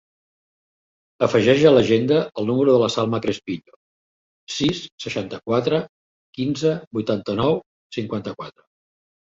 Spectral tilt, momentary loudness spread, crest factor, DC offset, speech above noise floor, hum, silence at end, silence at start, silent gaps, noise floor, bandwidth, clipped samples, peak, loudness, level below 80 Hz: -6 dB/octave; 16 LU; 20 dB; under 0.1%; over 70 dB; none; 0.9 s; 1.2 s; 3.76-4.47 s, 4.92-4.98 s, 5.89-6.33 s, 6.87-6.91 s, 7.66-7.90 s; under -90 dBFS; 7.8 kHz; under 0.1%; -2 dBFS; -21 LUFS; -56 dBFS